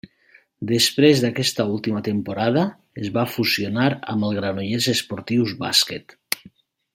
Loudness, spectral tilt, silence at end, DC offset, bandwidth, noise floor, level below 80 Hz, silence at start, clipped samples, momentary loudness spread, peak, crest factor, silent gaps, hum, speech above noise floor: -21 LUFS; -4.5 dB/octave; 0.45 s; under 0.1%; 16.5 kHz; -56 dBFS; -62 dBFS; 0.6 s; under 0.1%; 12 LU; 0 dBFS; 22 dB; none; none; 35 dB